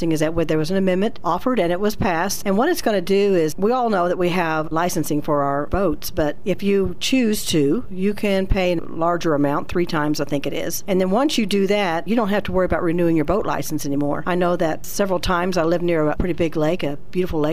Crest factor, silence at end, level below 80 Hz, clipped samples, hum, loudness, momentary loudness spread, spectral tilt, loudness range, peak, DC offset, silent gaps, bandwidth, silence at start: 14 dB; 0 s; -36 dBFS; under 0.1%; none; -20 LUFS; 4 LU; -5.5 dB/octave; 1 LU; -6 dBFS; 4%; none; 15.5 kHz; 0 s